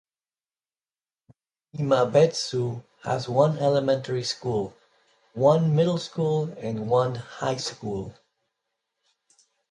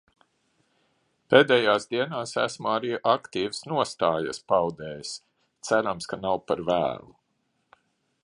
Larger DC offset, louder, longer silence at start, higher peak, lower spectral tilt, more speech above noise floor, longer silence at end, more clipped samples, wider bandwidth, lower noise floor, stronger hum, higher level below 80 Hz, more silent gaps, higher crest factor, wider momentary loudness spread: neither; about the same, -25 LUFS vs -25 LUFS; first, 1.75 s vs 1.3 s; second, -6 dBFS vs -2 dBFS; first, -6 dB/octave vs -4 dB/octave; first, over 66 dB vs 49 dB; first, 1.6 s vs 1.25 s; neither; about the same, 11 kHz vs 11 kHz; first, under -90 dBFS vs -74 dBFS; neither; about the same, -62 dBFS vs -64 dBFS; neither; about the same, 20 dB vs 24 dB; second, 12 LU vs 15 LU